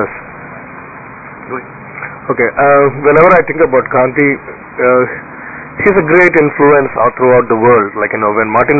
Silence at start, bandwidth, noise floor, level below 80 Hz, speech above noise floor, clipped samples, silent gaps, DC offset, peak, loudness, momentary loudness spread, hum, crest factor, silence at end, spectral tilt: 0 s; 8 kHz; -30 dBFS; -44 dBFS; 20 dB; under 0.1%; none; under 0.1%; 0 dBFS; -10 LUFS; 21 LU; none; 10 dB; 0 s; -9.5 dB/octave